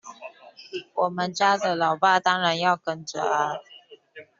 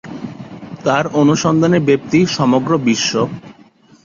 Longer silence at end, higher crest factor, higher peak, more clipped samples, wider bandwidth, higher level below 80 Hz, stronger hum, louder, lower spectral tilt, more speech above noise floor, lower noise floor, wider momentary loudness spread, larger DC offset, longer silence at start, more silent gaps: second, 0.15 s vs 0.55 s; about the same, 18 dB vs 14 dB; second, -6 dBFS vs -2 dBFS; neither; about the same, 7.8 kHz vs 7.6 kHz; second, -72 dBFS vs -52 dBFS; neither; second, -23 LUFS vs -15 LUFS; second, -1.5 dB/octave vs -5.5 dB/octave; second, 25 dB vs 33 dB; about the same, -48 dBFS vs -47 dBFS; about the same, 17 LU vs 17 LU; neither; about the same, 0.05 s vs 0.05 s; neither